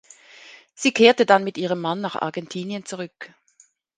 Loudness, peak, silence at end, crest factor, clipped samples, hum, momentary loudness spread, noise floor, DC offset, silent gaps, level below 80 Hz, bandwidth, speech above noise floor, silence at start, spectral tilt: -21 LUFS; 0 dBFS; 0.7 s; 22 dB; under 0.1%; none; 18 LU; -59 dBFS; under 0.1%; none; -74 dBFS; 9.8 kHz; 38 dB; 0.45 s; -4 dB/octave